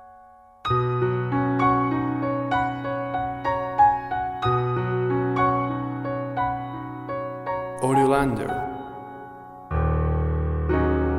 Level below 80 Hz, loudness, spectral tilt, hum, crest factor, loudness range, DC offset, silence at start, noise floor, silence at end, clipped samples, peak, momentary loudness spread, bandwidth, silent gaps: -36 dBFS; -24 LUFS; -7.5 dB/octave; none; 16 dB; 3 LU; under 0.1%; 0 s; -50 dBFS; 0 s; under 0.1%; -8 dBFS; 13 LU; 12.5 kHz; none